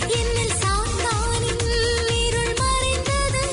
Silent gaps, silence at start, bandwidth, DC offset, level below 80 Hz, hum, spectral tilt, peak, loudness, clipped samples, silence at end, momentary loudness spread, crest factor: none; 0 s; 11 kHz; under 0.1%; -28 dBFS; none; -3 dB/octave; -10 dBFS; -21 LUFS; under 0.1%; 0 s; 2 LU; 10 dB